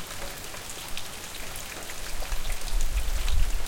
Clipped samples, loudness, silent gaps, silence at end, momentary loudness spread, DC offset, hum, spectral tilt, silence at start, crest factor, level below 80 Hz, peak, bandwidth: under 0.1%; -34 LUFS; none; 0 s; 6 LU; under 0.1%; none; -2.5 dB/octave; 0 s; 16 dB; -30 dBFS; -10 dBFS; 17 kHz